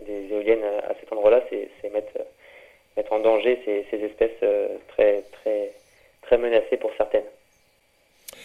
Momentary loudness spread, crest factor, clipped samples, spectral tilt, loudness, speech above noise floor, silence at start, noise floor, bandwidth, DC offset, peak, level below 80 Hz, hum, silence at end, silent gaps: 14 LU; 20 dB; under 0.1%; -4.5 dB/octave; -24 LUFS; 41 dB; 0 s; -63 dBFS; 13.5 kHz; under 0.1%; -4 dBFS; -54 dBFS; none; 0 s; none